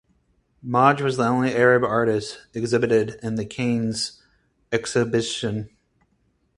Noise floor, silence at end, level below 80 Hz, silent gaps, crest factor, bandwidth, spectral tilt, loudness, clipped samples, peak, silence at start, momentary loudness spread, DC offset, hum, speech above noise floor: -67 dBFS; 0.9 s; -56 dBFS; none; 22 dB; 11.5 kHz; -5.5 dB/octave; -22 LUFS; under 0.1%; -2 dBFS; 0.65 s; 12 LU; under 0.1%; none; 46 dB